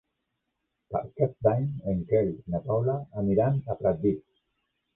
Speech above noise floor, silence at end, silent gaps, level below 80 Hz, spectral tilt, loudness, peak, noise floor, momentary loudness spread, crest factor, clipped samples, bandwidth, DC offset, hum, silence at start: 54 dB; 0.75 s; none; -52 dBFS; -13 dB/octave; -28 LUFS; -10 dBFS; -81 dBFS; 9 LU; 18 dB; under 0.1%; 3.8 kHz; under 0.1%; none; 0.9 s